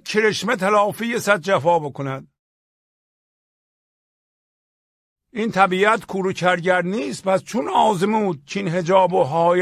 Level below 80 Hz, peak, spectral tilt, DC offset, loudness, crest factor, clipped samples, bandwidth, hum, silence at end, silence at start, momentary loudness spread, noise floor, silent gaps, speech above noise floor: -62 dBFS; 0 dBFS; -5 dB/octave; under 0.1%; -19 LUFS; 20 dB; under 0.1%; 15 kHz; none; 0 s; 0.05 s; 9 LU; under -90 dBFS; 2.39-5.16 s; over 71 dB